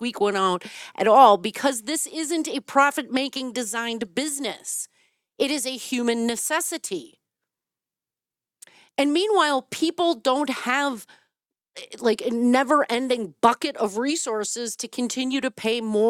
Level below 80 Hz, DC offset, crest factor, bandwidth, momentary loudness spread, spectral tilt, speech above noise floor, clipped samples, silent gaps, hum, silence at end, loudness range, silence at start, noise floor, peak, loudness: -74 dBFS; under 0.1%; 22 dB; 16.5 kHz; 9 LU; -2.5 dB/octave; over 67 dB; under 0.1%; none; none; 0 s; 6 LU; 0 s; under -90 dBFS; -2 dBFS; -23 LUFS